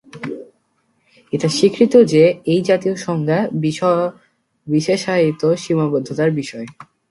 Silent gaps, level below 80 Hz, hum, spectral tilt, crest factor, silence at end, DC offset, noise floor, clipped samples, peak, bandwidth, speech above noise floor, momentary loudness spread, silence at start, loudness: none; -60 dBFS; none; -6 dB/octave; 16 dB; 0.3 s; under 0.1%; -64 dBFS; under 0.1%; 0 dBFS; 11.5 kHz; 48 dB; 17 LU; 0.15 s; -17 LUFS